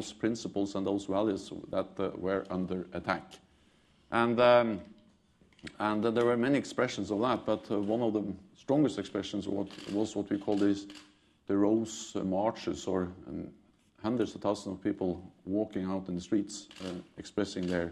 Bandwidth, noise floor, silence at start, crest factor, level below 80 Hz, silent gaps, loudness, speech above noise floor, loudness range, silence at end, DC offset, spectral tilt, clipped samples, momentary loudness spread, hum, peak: 11 kHz; -65 dBFS; 0 s; 22 dB; -66 dBFS; none; -32 LUFS; 34 dB; 6 LU; 0 s; under 0.1%; -6 dB/octave; under 0.1%; 13 LU; none; -12 dBFS